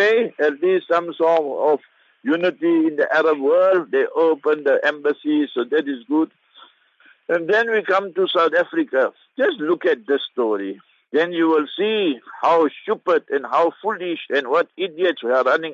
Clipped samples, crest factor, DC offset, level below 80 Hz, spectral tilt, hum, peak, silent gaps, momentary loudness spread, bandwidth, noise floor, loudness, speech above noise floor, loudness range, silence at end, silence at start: under 0.1%; 14 dB; under 0.1%; -80 dBFS; -5.5 dB/octave; none; -4 dBFS; none; 7 LU; 7.4 kHz; -55 dBFS; -20 LUFS; 36 dB; 3 LU; 0 s; 0 s